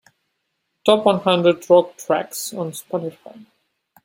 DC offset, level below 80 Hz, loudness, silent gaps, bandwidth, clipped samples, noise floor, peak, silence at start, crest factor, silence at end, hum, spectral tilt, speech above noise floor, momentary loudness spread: under 0.1%; -66 dBFS; -19 LUFS; none; 16.5 kHz; under 0.1%; -74 dBFS; 0 dBFS; 0.85 s; 20 dB; 0.95 s; none; -4.5 dB/octave; 55 dB; 12 LU